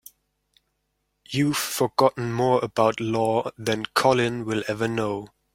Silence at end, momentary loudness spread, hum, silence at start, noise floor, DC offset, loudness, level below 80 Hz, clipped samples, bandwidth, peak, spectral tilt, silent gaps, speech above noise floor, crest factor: 0.25 s; 7 LU; none; 1.3 s; -75 dBFS; under 0.1%; -24 LUFS; -60 dBFS; under 0.1%; 16.5 kHz; -4 dBFS; -5 dB/octave; none; 52 dB; 20 dB